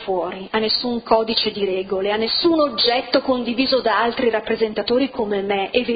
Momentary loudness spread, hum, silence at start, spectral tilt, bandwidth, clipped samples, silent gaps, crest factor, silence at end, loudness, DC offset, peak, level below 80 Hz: 6 LU; none; 0 s; -7.5 dB/octave; 5.2 kHz; under 0.1%; none; 18 dB; 0 s; -19 LUFS; under 0.1%; -2 dBFS; -52 dBFS